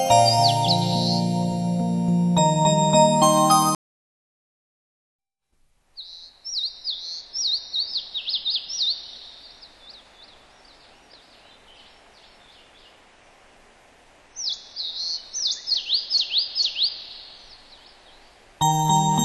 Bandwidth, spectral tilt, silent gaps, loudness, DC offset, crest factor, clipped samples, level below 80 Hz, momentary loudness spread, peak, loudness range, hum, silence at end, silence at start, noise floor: 12 kHz; -4 dB/octave; 3.75-5.19 s; -21 LUFS; under 0.1%; 20 dB; under 0.1%; -58 dBFS; 21 LU; -4 dBFS; 14 LU; none; 0 s; 0 s; -66 dBFS